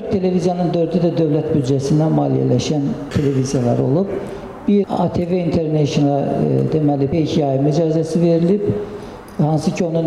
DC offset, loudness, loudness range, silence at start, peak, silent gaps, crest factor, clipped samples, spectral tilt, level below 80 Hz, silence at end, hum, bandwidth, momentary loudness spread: under 0.1%; -17 LUFS; 2 LU; 0 s; -6 dBFS; none; 10 dB; under 0.1%; -7.5 dB/octave; -46 dBFS; 0 s; none; 11.5 kHz; 5 LU